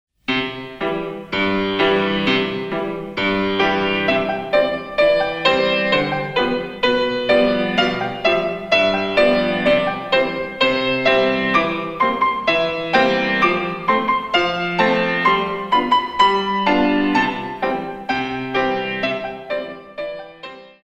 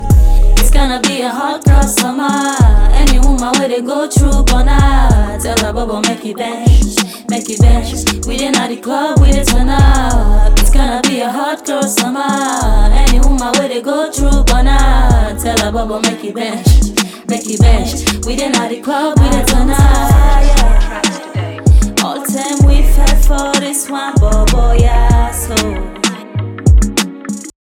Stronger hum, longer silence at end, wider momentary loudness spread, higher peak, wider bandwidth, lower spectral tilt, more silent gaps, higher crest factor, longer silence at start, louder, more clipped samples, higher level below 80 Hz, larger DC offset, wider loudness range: neither; second, 0.15 s vs 0.3 s; about the same, 8 LU vs 7 LU; about the same, -2 dBFS vs 0 dBFS; second, 9.6 kHz vs 16 kHz; about the same, -5.5 dB/octave vs -4.5 dB/octave; neither; first, 18 dB vs 8 dB; first, 0.3 s vs 0 s; second, -18 LUFS vs -13 LUFS; neither; second, -48 dBFS vs -12 dBFS; neither; about the same, 3 LU vs 2 LU